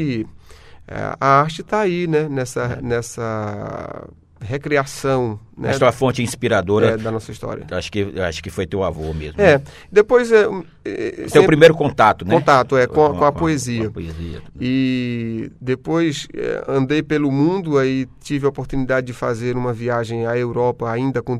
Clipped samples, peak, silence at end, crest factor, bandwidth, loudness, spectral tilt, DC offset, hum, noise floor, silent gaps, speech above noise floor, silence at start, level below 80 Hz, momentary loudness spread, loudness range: under 0.1%; 0 dBFS; 0 s; 18 dB; 14 kHz; -18 LUFS; -6 dB/octave; under 0.1%; none; -42 dBFS; none; 24 dB; 0 s; -42 dBFS; 13 LU; 7 LU